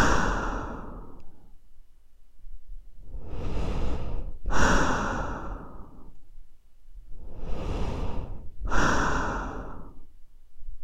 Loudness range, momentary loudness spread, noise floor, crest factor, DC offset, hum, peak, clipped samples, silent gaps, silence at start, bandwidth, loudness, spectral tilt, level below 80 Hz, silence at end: 9 LU; 26 LU; -46 dBFS; 20 dB; under 0.1%; none; -6 dBFS; under 0.1%; none; 0 s; 8.6 kHz; -30 LUFS; -5 dB/octave; -34 dBFS; 0 s